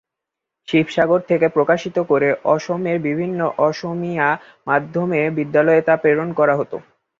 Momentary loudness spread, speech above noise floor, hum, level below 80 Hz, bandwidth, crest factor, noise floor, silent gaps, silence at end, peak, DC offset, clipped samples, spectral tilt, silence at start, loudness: 7 LU; 65 dB; none; -62 dBFS; 7.4 kHz; 16 dB; -83 dBFS; none; 0.4 s; -2 dBFS; under 0.1%; under 0.1%; -7 dB/octave; 0.7 s; -18 LUFS